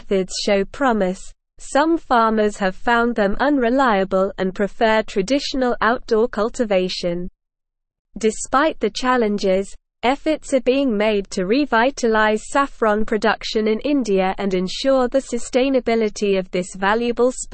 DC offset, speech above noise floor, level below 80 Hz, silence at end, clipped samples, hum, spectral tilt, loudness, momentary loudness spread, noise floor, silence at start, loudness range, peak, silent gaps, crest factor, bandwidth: 0.4%; 61 dB; -40 dBFS; 0 s; under 0.1%; none; -4.5 dB/octave; -19 LUFS; 5 LU; -79 dBFS; 0.05 s; 3 LU; -4 dBFS; 7.99-8.05 s; 14 dB; 8.8 kHz